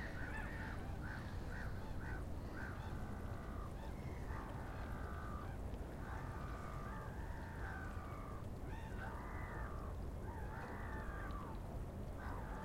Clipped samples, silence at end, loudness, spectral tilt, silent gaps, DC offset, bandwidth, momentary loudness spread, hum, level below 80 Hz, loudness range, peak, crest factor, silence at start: under 0.1%; 0 s; -48 LUFS; -7 dB/octave; none; under 0.1%; 16 kHz; 2 LU; none; -50 dBFS; 1 LU; -32 dBFS; 14 dB; 0 s